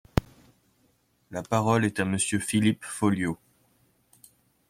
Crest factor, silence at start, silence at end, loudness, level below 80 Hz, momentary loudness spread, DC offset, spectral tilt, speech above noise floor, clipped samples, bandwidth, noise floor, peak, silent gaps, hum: 24 dB; 0.15 s; 1.35 s; -26 LUFS; -48 dBFS; 11 LU; under 0.1%; -5 dB/octave; 42 dB; under 0.1%; 16 kHz; -68 dBFS; -4 dBFS; none; none